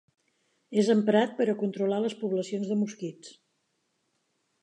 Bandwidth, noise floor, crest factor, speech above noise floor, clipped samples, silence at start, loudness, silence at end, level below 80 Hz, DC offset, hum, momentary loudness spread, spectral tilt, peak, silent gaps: 9.8 kHz; -76 dBFS; 18 dB; 49 dB; under 0.1%; 0.7 s; -27 LUFS; 1.3 s; -82 dBFS; under 0.1%; none; 9 LU; -6 dB/octave; -12 dBFS; none